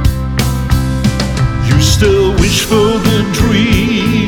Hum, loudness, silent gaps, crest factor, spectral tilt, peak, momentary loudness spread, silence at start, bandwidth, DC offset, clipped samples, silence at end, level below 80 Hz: none; -12 LUFS; none; 10 dB; -5 dB/octave; 0 dBFS; 5 LU; 0 s; 19 kHz; under 0.1%; under 0.1%; 0 s; -20 dBFS